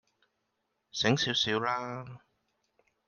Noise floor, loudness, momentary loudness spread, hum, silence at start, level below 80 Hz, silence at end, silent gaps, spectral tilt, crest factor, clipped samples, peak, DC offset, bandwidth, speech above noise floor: -81 dBFS; -29 LUFS; 15 LU; none; 0.95 s; -68 dBFS; 0.9 s; none; -4 dB/octave; 22 dB; under 0.1%; -12 dBFS; under 0.1%; 10 kHz; 50 dB